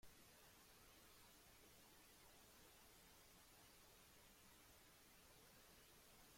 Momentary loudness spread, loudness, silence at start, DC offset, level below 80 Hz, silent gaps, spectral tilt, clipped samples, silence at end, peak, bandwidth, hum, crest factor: 1 LU; -67 LUFS; 0 s; under 0.1%; -80 dBFS; none; -2 dB/octave; under 0.1%; 0 s; -52 dBFS; 16.5 kHz; none; 16 dB